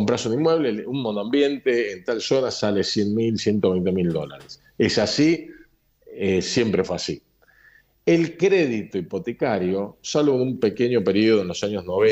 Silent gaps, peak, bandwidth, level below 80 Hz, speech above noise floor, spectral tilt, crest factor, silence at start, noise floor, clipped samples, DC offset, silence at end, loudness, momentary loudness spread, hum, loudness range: none; -8 dBFS; 15.5 kHz; -60 dBFS; 34 dB; -5.5 dB/octave; 14 dB; 0 s; -55 dBFS; under 0.1%; under 0.1%; 0 s; -22 LUFS; 8 LU; none; 2 LU